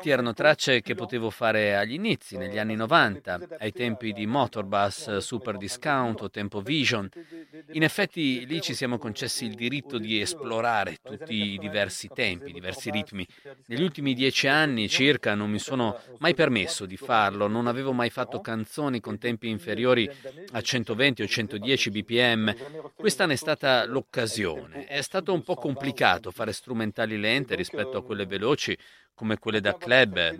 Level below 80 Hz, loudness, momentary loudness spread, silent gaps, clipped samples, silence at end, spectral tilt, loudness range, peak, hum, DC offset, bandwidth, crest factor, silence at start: -64 dBFS; -26 LUFS; 11 LU; none; under 0.1%; 0 s; -4 dB/octave; 4 LU; -2 dBFS; none; under 0.1%; 16 kHz; 24 dB; 0 s